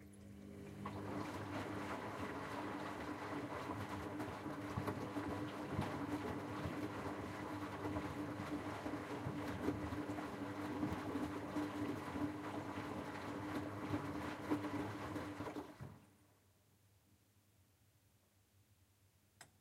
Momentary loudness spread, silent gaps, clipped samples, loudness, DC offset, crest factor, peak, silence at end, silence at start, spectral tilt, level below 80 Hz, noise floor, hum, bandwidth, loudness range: 5 LU; none; under 0.1%; -45 LUFS; under 0.1%; 20 dB; -26 dBFS; 0.15 s; 0 s; -6.5 dB/octave; -66 dBFS; -74 dBFS; none; 16 kHz; 4 LU